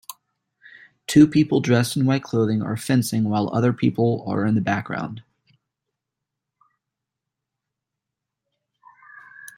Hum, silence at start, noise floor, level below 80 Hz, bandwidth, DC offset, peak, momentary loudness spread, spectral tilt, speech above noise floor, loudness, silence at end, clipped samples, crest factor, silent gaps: none; 0.1 s; -84 dBFS; -60 dBFS; 16.5 kHz; under 0.1%; -4 dBFS; 15 LU; -6.5 dB/octave; 64 dB; -21 LUFS; 0.1 s; under 0.1%; 20 dB; none